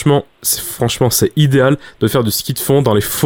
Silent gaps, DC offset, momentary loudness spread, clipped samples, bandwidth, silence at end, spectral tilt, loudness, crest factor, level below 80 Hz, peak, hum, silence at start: none; under 0.1%; 5 LU; under 0.1%; 18.5 kHz; 0 s; -5 dB/octave; -14 LUFS; 12 dB; -42 dBFS; -2 dBFS; none; 0 s